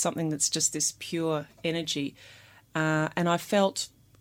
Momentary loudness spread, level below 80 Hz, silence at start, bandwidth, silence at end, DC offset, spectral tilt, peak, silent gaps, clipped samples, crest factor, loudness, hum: 9 LU; -68 dBFS; 0 s; 17 kHz; 0.35 s; under 0.1%; -3.5 dB/octave; -12 dBFS; none; under 0.1%; 18 dB; -28 LUFS; none